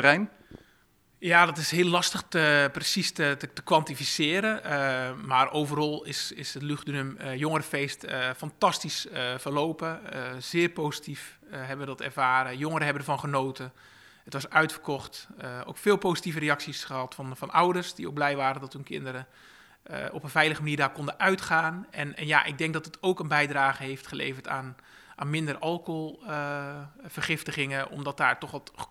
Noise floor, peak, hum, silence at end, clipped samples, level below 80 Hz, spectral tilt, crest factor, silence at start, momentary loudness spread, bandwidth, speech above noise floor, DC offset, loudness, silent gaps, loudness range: -64 dBFS; -2 dBFS; none; 0.05 s; under 0.1%; -68 dBFS; -4 dB/octave; 26 dB; 0 s; 13 LU; 16 kHz; 36 dB; under 0.1%; -28 LUFS; none; 6 LU